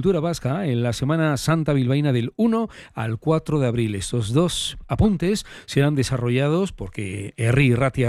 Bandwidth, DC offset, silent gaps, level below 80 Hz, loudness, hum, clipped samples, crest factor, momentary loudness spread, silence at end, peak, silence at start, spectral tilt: 13 kHz; under 0.1%; none; -42 dBFS; -22 LUFS; none; under 0.1%; 16 dB; 8 LU; 0 s; -6 dBFS; 0 s; -6 dB/octave